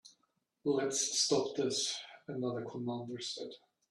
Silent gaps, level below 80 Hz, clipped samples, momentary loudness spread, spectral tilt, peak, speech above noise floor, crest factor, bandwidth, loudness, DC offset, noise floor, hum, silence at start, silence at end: none; -80 dBFS; under 0.1%; 12 LU; -3 dB/octave; -18 dBFS; 44 dB; 18 dB; 12.5 kHz; -35 LUFS; under 0.1%; -79 dBFS; none; 0.05 s; 0.35 s